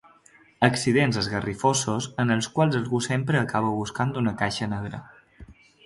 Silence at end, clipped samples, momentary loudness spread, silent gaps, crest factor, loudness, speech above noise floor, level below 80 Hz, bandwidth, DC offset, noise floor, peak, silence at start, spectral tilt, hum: 0.35 s; under 0.1%; 7 LU; none; 22 dB; -24 LUFS; 32 dB; -54 dBFS; 11.5 kHz; under 0.1%; -56 dBFS; -2 dBFS; 0.6 s; -5 dB/octave; none